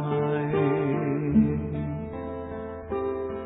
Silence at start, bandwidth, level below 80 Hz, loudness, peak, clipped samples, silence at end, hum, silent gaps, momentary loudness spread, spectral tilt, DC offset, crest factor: 0 s; 3.9 kHz; -46 dBFS; -27 LUFS; -10 dBFS; under 0.1%; 0 s; none; none; 12 LU; -12.5 dB/octave; under 0.1%; 16 dB